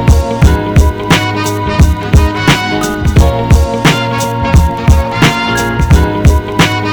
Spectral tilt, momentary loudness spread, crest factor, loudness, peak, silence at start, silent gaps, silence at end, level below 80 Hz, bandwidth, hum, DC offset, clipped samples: -5.5 dB/octave; 4 LU; 8 dB; -10 LUFS; 0 dBFS; 0 s; none; 0 s; -14 dBFS; 19 kHz; none; under 0.1%; 2%